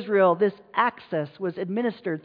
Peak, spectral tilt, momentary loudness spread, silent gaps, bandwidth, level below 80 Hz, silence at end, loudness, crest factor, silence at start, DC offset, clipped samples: -8 dBFS; -9.5 dB/octave; 10 LU; none; 5 kHz; -76 dBFS; 0.05 s; -25 LUFS; 16 dB; 0 s; under 0.1%; under 0.1%